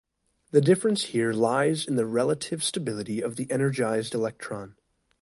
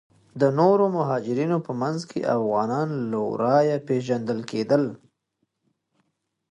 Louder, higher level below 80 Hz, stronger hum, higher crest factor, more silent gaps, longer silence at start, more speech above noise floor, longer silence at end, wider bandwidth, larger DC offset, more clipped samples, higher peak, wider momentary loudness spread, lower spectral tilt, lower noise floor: about the same, -26 LUFS vs -24 LUFS; about the same, -66 dBFS vs -70 dBFS; neither; about the same, 20 dB vs 18 dB; neither; first, 0.55 s vs 0.35 s; second, 24 dB vs 53 dB; second, 0.5 s vs 1.55 s; about the same, 11.5 kHz vs 10.5 kHz; neither; neither; about the same, -6 dBFS vs -6 dBFS; about the same, 9 LU vs 8 LU; second, -5 dB/octave vs -7.5 dB/octave; second, -49 dBFS vs -76 dBFS